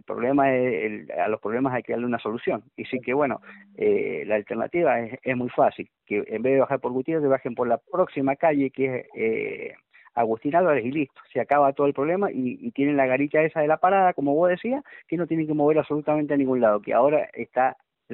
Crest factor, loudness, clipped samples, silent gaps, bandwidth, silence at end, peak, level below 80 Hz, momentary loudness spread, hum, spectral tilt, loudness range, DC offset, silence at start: 16 dB; -24 LUFS; under 0.1%; none; 4.2 kHz; 0 s; -6 dBFS; -68 dBFS; 9 LU; none; -6 dB/octave; 4 LU; under 0.1%; 0.1 s